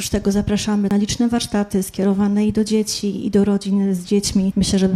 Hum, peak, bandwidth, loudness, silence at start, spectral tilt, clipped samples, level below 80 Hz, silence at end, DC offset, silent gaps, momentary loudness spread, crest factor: none; -4 dBFS; 14.5 kHz; -19 LUFS; 0 s; -5.5 dB/octave; under 0.1%; -38 dBFS; 0 s; under 0.1%; none; 3 LU; 14 dB